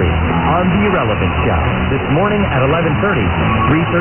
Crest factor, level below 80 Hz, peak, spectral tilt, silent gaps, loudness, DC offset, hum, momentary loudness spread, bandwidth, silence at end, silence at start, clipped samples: 12 dB; -26 dBFS; 0 dBFS; -10.5 dB/octave; none; -14 LUFS; under 0.1%; none; 2 LU; 3.4 kHz; 0 s; 0 s; under 0.1%